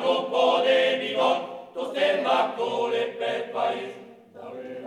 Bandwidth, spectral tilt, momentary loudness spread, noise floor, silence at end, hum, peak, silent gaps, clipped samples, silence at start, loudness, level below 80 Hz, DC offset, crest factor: 11 kHz; -3.5 dB/octave; 17 LU; -45 dBFS; 0 s; none; -8 dBFS; none; under 0.1%; 0 s; -24 LUFS; -78 dBFS; under 0.1%; 16 dB